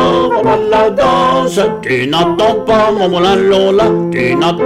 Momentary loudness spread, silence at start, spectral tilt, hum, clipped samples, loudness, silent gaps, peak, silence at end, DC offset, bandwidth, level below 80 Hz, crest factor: 4 LU; 0 s; -5.5 dB/octave; none; under 0.1%; -11 LUFS; none; -2 dBFS; 0 s; under 0.1%; 14.5 kHz; -38 dBFS; 10 dB